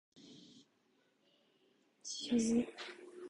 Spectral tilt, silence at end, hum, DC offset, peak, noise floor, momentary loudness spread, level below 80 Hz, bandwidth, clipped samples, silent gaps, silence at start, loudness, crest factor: -3.5 dB/octave; 0 s; none; under 0.1%; -24 dBFS; -76 dBFS; 25 LU; -74 dBFS; 11 kHz; under 0.1%; none; 0.15 s; -37 LUFS; 18 dB